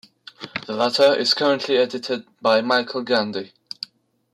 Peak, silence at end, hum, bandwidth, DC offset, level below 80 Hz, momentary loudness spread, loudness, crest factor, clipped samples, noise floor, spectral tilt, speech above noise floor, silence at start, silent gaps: -6 dBFS; 0.9 s; none; 14 kHz; under 0.1%; -70 dBFS; 17 LU; -20 LUFS; 16 dB; under 0.1%; -47 dBFS; -3.5 dB/octave; 27 dB; 0.4 s; none